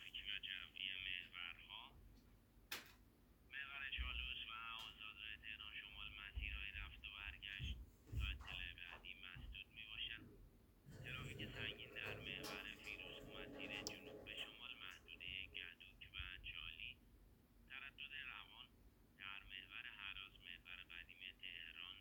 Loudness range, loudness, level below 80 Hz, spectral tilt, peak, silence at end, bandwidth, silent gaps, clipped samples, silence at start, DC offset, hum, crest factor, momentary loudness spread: 4 LU; -51 LUFS; -62 dBFS; -3 dB/octave; -26 dBFS; 0 s; over 20 kHz; none; under 0.1%; 0 s; under 0.1%; none; 28 dB; 9 LU